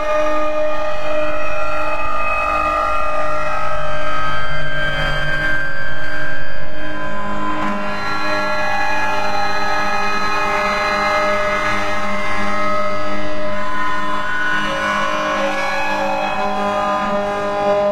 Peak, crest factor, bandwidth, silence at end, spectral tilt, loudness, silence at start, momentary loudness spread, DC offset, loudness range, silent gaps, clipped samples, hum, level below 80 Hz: -4 dBFS; 10 dB; 15.5 kHz; 0 s; -4 dB/octave; -19 LUFS; 0 s; 6 LU; under 0.1%; 4 LU; none; under 0.1%; none; -34 dBFS